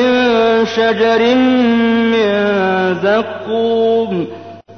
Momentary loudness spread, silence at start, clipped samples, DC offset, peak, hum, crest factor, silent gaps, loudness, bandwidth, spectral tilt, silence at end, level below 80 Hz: 8 LU; 0 s; under 0.1%; under 0.1%; -4 dBFS; none; 10 dB; none; -13 LUFS; 6.6 kHz; -6 dB/octave; 0 s; -56 dBFS